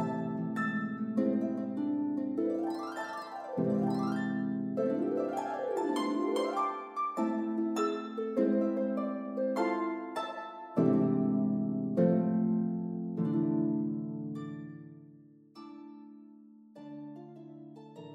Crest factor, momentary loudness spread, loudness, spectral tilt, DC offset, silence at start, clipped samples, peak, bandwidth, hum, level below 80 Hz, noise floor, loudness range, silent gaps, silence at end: 18 dB; 19 LU; -32 LUFS; -8 dB/octave; under 0.1%; 0 s; under 0.1%; -16 dBFS; 11.5 kHz; none; -84 dBFS; -57 dBFS; 9 LU; none; 0 s